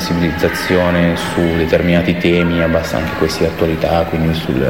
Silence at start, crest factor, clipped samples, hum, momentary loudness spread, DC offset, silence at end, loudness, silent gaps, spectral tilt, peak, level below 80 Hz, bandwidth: 0 s; 14 dB; under 0.1%; none; 4 LU; 0.7%; 0 s; -15 LUFS; none; -6 dB/octave; 0 dBFS; -32 dBFS; 16.5 kHz